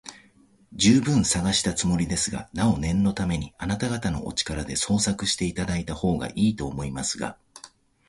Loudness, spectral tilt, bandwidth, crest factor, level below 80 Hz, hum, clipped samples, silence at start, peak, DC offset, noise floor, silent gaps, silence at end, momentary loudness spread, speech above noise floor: -25 LUFS; -4 dB/octave; 11.5 kHz; 18 dB; -42 dBFS; none; under 0.1%; 0.05 s; -6 dBFS; under 0.1%; -58 dBFS; none; 0.4 s; 9 LU; 33 dB